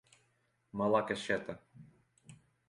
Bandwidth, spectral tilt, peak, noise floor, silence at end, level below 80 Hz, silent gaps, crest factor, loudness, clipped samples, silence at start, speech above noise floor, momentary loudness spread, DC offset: 11.5 kHz; -5.5 dB/octave; -16 dBFS; -76 dBFS; 0.35 s; -70 dBFS; none; 22 dB; -34 LUFS; under 0.1%; 0.75 s; 42 dB; 16 LU; under 0.1%